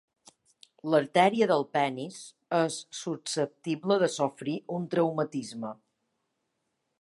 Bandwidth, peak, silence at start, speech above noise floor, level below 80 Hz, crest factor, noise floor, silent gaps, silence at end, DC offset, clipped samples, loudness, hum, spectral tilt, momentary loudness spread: 11.5 kHz; -8 dBFS; 0.85 s; 52 dB; -80 dBFS; 22 dB; -80 dBFS; none; 1.25 s; under 0.1%; under 0.1%; -29 LUFS; none; -5 dB/octave; 15 LU